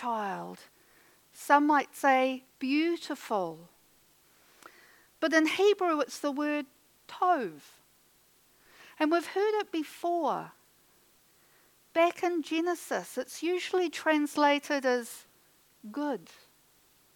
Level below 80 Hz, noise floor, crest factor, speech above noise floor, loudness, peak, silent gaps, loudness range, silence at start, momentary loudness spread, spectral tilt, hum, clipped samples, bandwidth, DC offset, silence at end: -82 dBFS; -65 dBFS; 22 dB; 36 dB; -29 LUFS; -8 dBFS; none; 4 LU; 0 s; 15 LU; -3.5 dB/octave; none; under 0.1%; 19 kHz; under 0.1%; 0.95 s